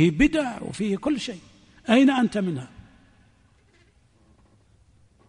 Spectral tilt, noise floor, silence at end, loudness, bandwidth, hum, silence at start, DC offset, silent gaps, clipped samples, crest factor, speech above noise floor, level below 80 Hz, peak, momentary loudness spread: -6 dB/octave; -60 dBFS; 2.6 s; -23 LUFS; 10.5 kHz; none; 0 s; under 0.1%; none; under 0.1%; 18 dB; 37 dB; -46 dBFS; -6 dBFS; 18 LU